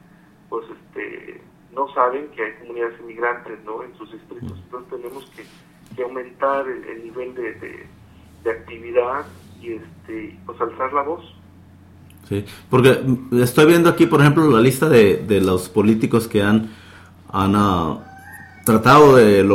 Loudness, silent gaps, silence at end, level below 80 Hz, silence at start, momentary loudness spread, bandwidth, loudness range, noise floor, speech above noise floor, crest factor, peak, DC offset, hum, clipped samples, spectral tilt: -17 LUFS; none; 0 s; -50 dBFS; 0.5 s; 22 LU; 16.5 kHz; 14 LU; -49 dBFS; 32 dB; 18 dB; 0 dBFS; under 0.1%; none; under 0.1%; -6.5 dB/octave